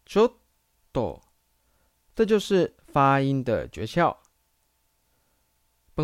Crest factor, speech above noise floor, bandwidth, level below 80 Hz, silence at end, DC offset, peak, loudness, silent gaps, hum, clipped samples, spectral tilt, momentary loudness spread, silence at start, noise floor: 18 dB; 47 dB; 14 kHz; -54 dBFS; 0 s; under 0.1%; -8 dBFS; -25 LUFS; none; none; under 0.1%; -6.5 dB/octave; 15 LU; 0.1 s; -70 dBFS